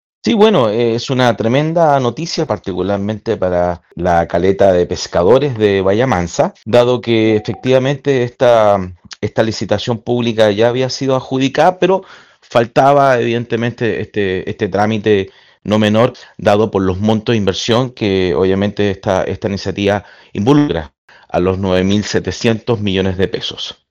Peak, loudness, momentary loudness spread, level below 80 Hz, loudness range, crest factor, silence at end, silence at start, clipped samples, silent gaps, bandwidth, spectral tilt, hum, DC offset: 0 dBFS; -14 LUFS; 7 LU; -44 dBFS; 3 LU; 14 dB; 0.2 s; 0.25 s; 0.3%; 20.98-21.08 s; 10.5 kHz; -6 dB/octave; none; under 0.1%